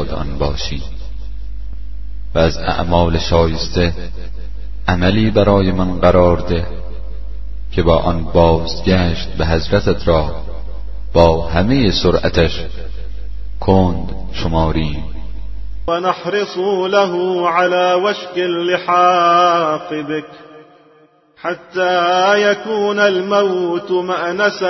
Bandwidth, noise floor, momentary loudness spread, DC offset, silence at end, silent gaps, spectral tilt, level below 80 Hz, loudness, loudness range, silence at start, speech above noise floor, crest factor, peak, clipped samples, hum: 6.2 kHz; -50 dBFS; 19 LU; under 0.1%; 0 s; none; -6.5 dB/octave; -28 dBFS; -15 LUFS; 4 LU; 0 s; 35 dB; 16 dB; 0 dBFS; under 0.1%; none